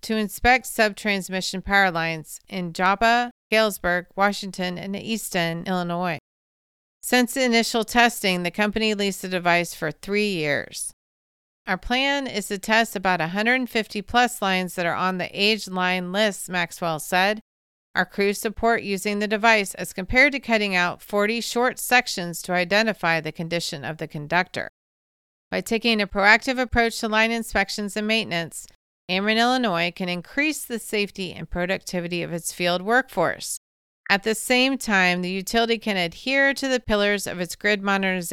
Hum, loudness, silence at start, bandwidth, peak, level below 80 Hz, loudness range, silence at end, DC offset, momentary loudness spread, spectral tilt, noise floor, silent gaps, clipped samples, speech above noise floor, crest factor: none; -22 LUFS; 0.05 s; 17 kHz; -2 dBFS; -46 dBFS; 4 LU; 0 s; under 0.1%; 10 LU; -3.5 dB/octave; under -90 dBFS; 3.31-3.50 s, 6.20-7.00 s, 10.93-11.65 s, 17.41-17.94 s, 24.69-25.51 s, 28.75-29.08 s, 33.57-34.04 s; under 0.1%; over 67 dB; 22 dB